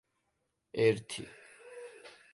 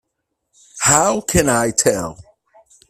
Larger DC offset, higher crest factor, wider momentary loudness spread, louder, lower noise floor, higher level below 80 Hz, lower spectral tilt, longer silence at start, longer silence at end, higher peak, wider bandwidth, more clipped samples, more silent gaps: neither; about the same, 22 dB vs 20 dB; first, 23 LU vs 8 LU; second, -33 LUFS vs -15 LUFS; first, -81 dBFS vs -75 dBFS; second, -72 dBFS vs -40 dBFS; first, -5 dB/octave vs -3 dB/octave; about the same, 0.75 s vs 0.75 s; second, 0.25 s vs 0.75 s; second, -16 dBFS vs 0 dBFS; second, 11.5 kHz vs 16 kHz; neither; neither